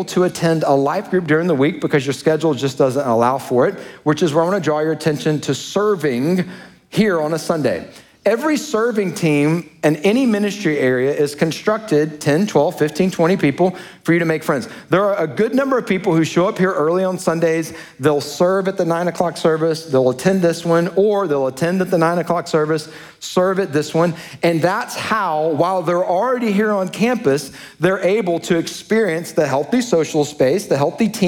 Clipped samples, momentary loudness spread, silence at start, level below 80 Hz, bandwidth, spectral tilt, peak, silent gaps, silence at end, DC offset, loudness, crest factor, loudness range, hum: under 0.1%; 4 LU; 0 s; -58 dBFS; 18 kHz; -6 dB/octave; -2 dBFS; none; 0 s; under 0.1%; -17 LUFS; 16 dB; 2 LU; none